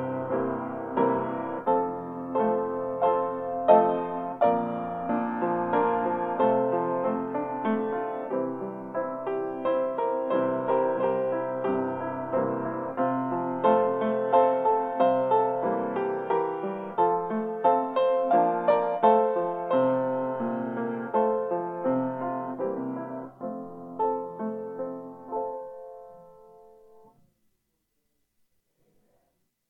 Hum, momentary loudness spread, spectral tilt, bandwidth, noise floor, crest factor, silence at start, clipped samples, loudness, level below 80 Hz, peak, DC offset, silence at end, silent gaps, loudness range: none; 11 LU; -9.5 dB/octave; 4.3 kHz; -76 dBFS; 24 dB; 0 s; under 0.1%; -27 LUFS; -72 dBFS; -4 dBFS; under 0.1%; 3.25 s; none; 10 LU